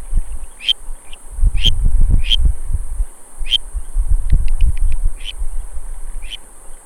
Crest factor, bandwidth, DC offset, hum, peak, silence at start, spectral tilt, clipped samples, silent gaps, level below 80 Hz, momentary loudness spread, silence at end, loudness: 14 dB; 11.5 kHz; under 0.1%; none; 0 dBFS; 0 s; -3 dB/octave; under 0.1%; none; -16 dBFS; 17 LU; 0.1 s; -20 LUFS